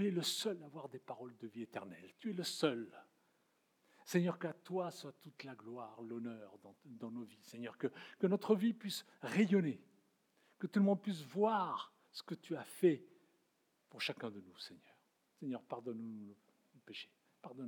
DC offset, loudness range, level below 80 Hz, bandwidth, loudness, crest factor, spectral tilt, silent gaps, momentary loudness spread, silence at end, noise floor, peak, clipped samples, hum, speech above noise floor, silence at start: under 0.1%; 10 LU; under -90 dBFS; over 20 kHz; -40 LUFS; 22 dB; -5.5 dB/octave; none; 18 LU; 0 s; -79 dBFS; -20 dBFS; under 0.1%; none; 39 dB; 0 s